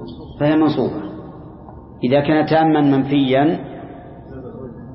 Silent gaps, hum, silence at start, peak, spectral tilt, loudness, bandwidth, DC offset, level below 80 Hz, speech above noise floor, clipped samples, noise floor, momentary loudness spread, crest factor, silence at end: none; none; 0 s; -2 dBFS; -12 dB/octave; -17 LUFS; 5.8 kHz; under 0.1%; -46 dBFS; 22 dB; under 0.1%; -37 dBFS; 22 LU; 16 dB; 0 s